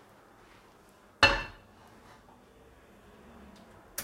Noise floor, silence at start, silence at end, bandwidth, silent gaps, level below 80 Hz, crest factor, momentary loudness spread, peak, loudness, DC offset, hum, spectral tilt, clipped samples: -59 dBFS; 1.2 s; 0 s; 16 kHz; none; -50 dBFS; 30 dB; 29 LU; -6 dBFS; -26 LUFS; under 0.1%; none; -2.5 dB/octave; under 0.1%